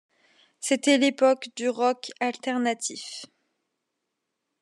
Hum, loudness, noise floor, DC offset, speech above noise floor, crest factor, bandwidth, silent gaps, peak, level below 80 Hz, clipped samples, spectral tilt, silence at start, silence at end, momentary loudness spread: none; -25 LUFS; -81 dBFS; under 0.1%; 57 dB; 18 dB; 12.5 kHz; none; -8 dBFS; under -90 dBFS; under 0.1%; -2 dB/octave; 0.6 s; 1.35 s; 14 LU